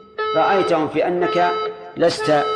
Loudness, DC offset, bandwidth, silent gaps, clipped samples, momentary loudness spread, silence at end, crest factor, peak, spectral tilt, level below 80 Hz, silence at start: -19 LUFS; under 0.1%; 10.5 kHz; none; under 0.1%; 5 LU; 0 s; 14 dB; -6 dBFS; -5 dB/octave; -58 dBFS; 0.2 s